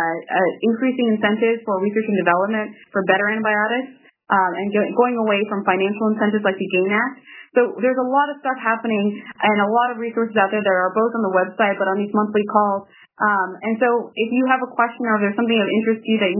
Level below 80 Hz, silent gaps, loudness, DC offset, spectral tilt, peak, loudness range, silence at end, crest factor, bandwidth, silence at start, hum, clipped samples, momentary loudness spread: -78 dBFS; none; -19 LUFS; under 0.1%; -9.5 dB/octave; 0 dBFS; 1 LU; 0 s; 18 dB; 3.1 kHz; 0 s; none; under 0.1%; 4 LU